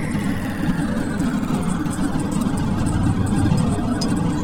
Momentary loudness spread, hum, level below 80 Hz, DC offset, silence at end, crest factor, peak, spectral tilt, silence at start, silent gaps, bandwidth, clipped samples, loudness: 4 LU; none; -32 dBFS; under 0.1%; 0 s; 14 dB; -6 dBFS; -6.5 dB/octave; 0 s; none; 17 kHz; under 0.1%; -21 LUFS